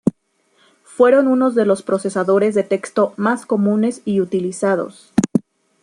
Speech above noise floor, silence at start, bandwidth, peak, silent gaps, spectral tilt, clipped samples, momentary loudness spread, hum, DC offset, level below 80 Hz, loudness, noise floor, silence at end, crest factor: 45 dB; 0.05 s; 11.5 kHz; -2 dBFS; none; -6.5 dB/octave; under 0.1%; 8 LU; none; under 0.1%; -58 dBFS; -17 LUFS; -61 dBFS; 0.4 s; 16 dB